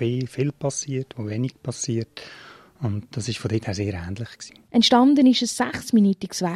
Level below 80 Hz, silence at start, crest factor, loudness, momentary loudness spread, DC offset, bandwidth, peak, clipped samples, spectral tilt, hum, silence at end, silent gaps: -58 dBFS; 0 s; 18 dB; -22 LUFS; 18 LU; under 0.1%; 13.5 kHz; -4 dBFS; under 0.1%; -5 dB/octave; none; 0 s; none